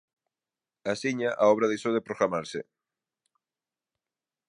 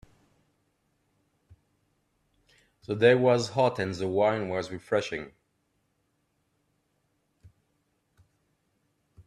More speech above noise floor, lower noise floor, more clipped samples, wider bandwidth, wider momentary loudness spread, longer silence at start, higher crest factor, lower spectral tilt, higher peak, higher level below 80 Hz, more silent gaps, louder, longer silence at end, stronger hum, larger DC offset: first, over 63 dB vs 49 dB; first, under -90 dBFS vs -75 dBFS; neither; about the same, 11 kHz vs 11 kHz; about the same, 15 LU vs 15 LU; second, 0.85 s vs 2.9 s; about the same, 22 dB vs 24 dB; about the same, -5 dB/octave vs -6 dB/octave; about the same, -10 dBFS vs -8 dBFS; second, -74 dBFS vs -68 dBFS; neither; about the same, -27 LUFS vs -26 LUFS; first, 1.85 s vs 0.05 s; neither; neither